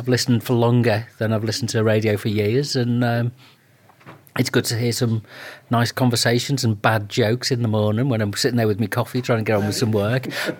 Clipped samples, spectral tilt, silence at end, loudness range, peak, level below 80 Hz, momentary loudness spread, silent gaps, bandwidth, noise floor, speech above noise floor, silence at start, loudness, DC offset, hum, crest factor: under 0.1%; -5.5 dB/octave; 0 s; 3 LU; -2 dBFS; -62 dBFS; 5 LU; none; 17.5 kHz; -53 dBFS; 33 dB; 0 s; -20 LUFS; under 0.1%; none; 18 dB